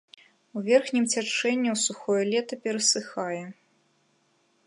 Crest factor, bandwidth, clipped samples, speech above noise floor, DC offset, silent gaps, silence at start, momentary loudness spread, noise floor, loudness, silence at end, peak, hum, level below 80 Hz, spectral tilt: 20 dB; 11.5 kHz; under 0.1%; 42 dB; under 0.1%; none; 0.55 s; 11 LU; -68 dBFS; -26 LUFS; 1.15 s; -8 dBFS; none; -84 dBFS; -2.5 dB/octave